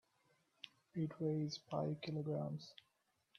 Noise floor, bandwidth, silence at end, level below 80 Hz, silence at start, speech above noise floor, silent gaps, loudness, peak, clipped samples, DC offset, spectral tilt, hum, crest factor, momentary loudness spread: -82 dBFS; 7 kHz; 0.65 s; -82 dBFS; 0.65 s; 40 dB; none; -43 LUFS; -26 dBFS; under 0.1%; under 0.1%; -7 dB/octave; none; 18 dB; 17 LU